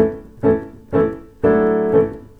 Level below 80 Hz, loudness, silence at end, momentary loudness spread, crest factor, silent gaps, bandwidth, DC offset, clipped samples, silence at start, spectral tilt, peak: -42 dBFS; -18 LUFS; 0.2 s; 7 LU; 16 dB; none; 3.8 kHz; under 0.1%; under 0.1%; 0 s; -10 dB/octave; 0 dBFS